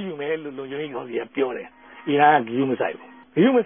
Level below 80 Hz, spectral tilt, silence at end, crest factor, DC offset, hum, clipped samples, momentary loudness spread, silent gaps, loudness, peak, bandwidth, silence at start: -70 dBFS; -10.5 dB/octave; 0 s; 18 dB; under 0.1%; none; under 0.1%; 17 LU; none; -23 LUFS; -4 dBFS; 3.7 kHz; 0 s